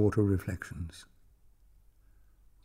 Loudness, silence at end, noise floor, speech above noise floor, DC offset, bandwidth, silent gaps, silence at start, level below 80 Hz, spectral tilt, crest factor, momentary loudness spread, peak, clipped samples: -33 LUFS; 1.65 s; -61 dBFS; 31 dB; under 0.1%; 15.5 kHz; none; 0 s; -52 dBFS; -8 dB/octave; 20 dB; 17 LU; -14 dBFS; under 0.1%